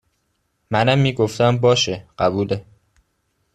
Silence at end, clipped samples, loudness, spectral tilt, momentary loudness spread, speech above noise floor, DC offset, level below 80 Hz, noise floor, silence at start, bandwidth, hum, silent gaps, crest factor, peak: 0.95 s; under 0.1%; -19 LUFS; -5.5 dB/octave; 8 LU; 51 dB; under 0.1%; -52 dBFS; -69 dBFS; 0.7 s; 12.5 kHz; none; none; 18 dB; -2 dBFS